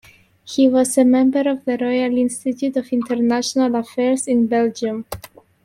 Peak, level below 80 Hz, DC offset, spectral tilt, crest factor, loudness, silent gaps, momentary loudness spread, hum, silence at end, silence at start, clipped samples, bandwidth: -4 dBFS; -56 dBFS; under 0.1%; -4 dB/octave; 14 dB; -18 LUFS; none; 10 LU; none; 0.4 s; 0.45 s; under 0.1%; 15 kHz